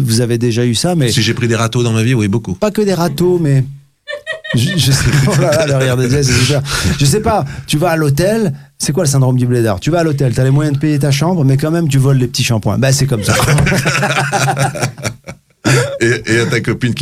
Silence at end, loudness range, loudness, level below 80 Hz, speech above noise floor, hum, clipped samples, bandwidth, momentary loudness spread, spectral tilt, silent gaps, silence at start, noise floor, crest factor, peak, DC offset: 0 s; 2 LU; -13 LUFS; -36 dBFS; 22 dB; none; under 0.1%; 15.5 kHz; 5 LU; -5 dB/octave; none; 0 s; -35 dBFS; 12 dB; 0 dBFS; under 0.1%